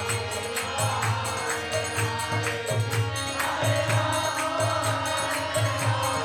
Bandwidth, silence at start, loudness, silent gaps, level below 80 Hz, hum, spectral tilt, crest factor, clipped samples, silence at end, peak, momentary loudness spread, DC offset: 17 kHz; 0 s; -26 LUFS; none; -54 dBFS; none; -3.5 dB/octave; 14 dB; under 0.1%; 0 s; -12 dBFS; 4 LU; under 0.1%